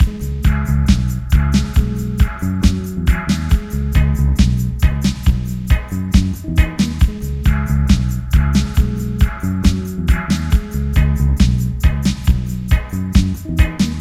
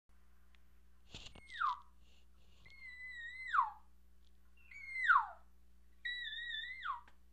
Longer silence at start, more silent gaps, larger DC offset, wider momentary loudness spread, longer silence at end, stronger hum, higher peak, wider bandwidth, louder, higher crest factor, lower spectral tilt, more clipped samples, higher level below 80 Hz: second, 0 s vs 1.1 s; neither; neither; second, 4 LU vs 22 LU; second, 0 s vs 0.25 s; neither; first, 0 dBFS vs -18 dBFS; first, 14 kHz vs 12.5 kHz; first, -17 LUFS vs -39 LUFS; second, 14 dB vs 24 dB; first, -6.5 dB/octave vs -1 dB/octave; neither; first, -18 dBFS vs -66 dBFS